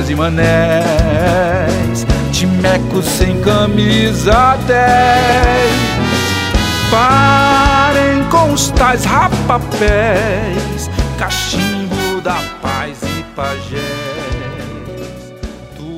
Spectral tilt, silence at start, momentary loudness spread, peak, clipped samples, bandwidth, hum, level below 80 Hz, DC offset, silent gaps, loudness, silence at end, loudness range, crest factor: -5 dB/octave; 0 s; 12 LU; 0 dBFS; under 0.1%; 16.5 kHz; none; -24 dBFS; under 0.1%; none; -12 LUFS; 0 s; 8 LU; 12 dB